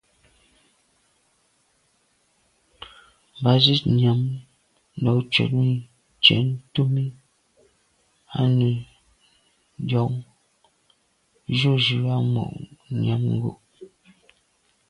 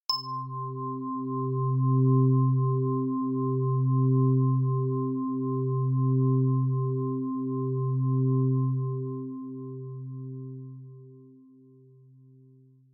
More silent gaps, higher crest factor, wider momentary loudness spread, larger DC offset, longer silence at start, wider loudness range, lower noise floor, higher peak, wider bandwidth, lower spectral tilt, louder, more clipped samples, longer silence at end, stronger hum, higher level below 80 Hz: neither; first, 24 dB vs 12 dB; about the same, 17 LU vs 15 LU; neither; first, 2.8 s vs 0.1 s; second, 6 LU vs 14 LU; first, -66 dBFS vs -57 dBFS; first, 0 dBFS vs -14 dBFS; first, 9.8 kHz vs 4.3 kHz; second, -7 dB/octave vs -10.5 dB/octave; first, -22 LUFS vs -27 LUFS; neither; second, 1.05 s vs 1.7 s; neither; first, -56 dBFS vs -86 dBFS